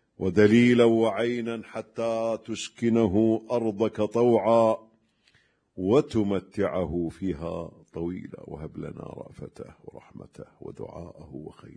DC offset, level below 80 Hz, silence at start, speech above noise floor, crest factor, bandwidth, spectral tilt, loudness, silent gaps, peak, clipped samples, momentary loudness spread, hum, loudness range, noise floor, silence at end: under 0.1%; -56 dBFS; 0.2 s; 40 dB; 20 dB; 10 kHz; -7 dB/octave; -25 LUFS; none; -6 dBFS; under 0.1%; 22 LU; none; 16 LU; -65 dBFS; 0.25 s